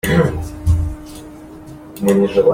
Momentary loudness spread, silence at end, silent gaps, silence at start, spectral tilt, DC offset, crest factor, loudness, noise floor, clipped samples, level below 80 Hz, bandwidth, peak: 22 LU; 0 s; none; 0.05 s; -7 dB/octave; under 0.1%; 16 dB; -17 LUFS; -35 dBFS; under 0.1%; -30 dBFS; 16 kHz; -2 dBFS